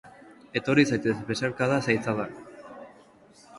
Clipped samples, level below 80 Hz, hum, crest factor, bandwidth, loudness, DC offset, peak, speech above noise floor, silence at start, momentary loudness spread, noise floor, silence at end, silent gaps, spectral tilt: under 0.1%; -62 dBFS; none; 22 dB; 11.5 kHz; -26 LUFS; under 0.1%; -8 dBFS; 29 dB; 0.05 s; 22 LU; -55 dBFS; 0 s; none; -5.5 dB/octave